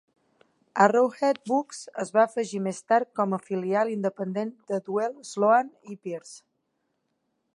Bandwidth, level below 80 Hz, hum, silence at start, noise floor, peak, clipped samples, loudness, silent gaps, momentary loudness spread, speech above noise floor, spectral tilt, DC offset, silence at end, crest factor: 11.5 kHz; -80 dBFS; none; 0.75 s; -76 dBFS; -4 dBFS; under 0.1%; -26 LUFS; none; 15 LU; 51 dB; -5.5 dB/octave; under 0.1%; 1.15 s; 22 dB